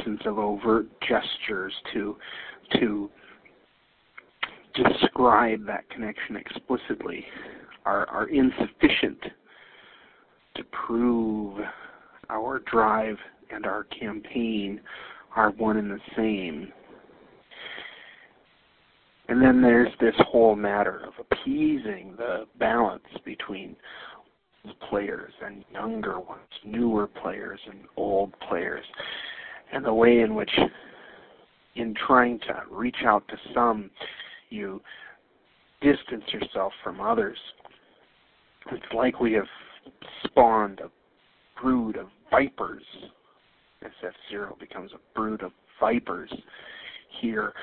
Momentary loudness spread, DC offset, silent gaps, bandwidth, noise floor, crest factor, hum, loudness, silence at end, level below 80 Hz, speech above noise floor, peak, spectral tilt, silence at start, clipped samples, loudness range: 21 LU; under 0.1%; none; 4.5 kHz; -64 dBFS; 24 dB; none; -26 LUFS; 0 s; -56 dBFS; 38 dB; -2 dBFS; -9.5 dB/octave; 0 s; under 0.1%; 8 LU